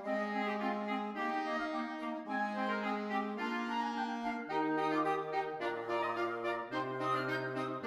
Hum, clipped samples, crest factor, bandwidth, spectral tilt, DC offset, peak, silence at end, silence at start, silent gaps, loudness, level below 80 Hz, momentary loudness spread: none; under 0.1%; 14 dB; 15 kHz; -6 dB/octave; under 0.1%; -22 dBFS; 0 s; 0 s; none; -36 LUFS; -78 dBFS; 4 LU